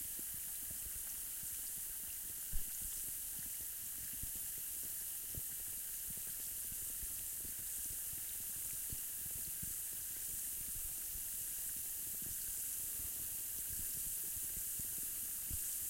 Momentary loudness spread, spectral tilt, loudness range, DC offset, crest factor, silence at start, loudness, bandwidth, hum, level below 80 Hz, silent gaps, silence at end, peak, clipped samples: 2 LU; -0.5 dB/octave; 2 LU; under 0.1%; 18 dB; 0 s; -41 LUFS; 16.5 kHz; none; -58 dBFS; none; 0 s; -26 dBFS; under 0.1%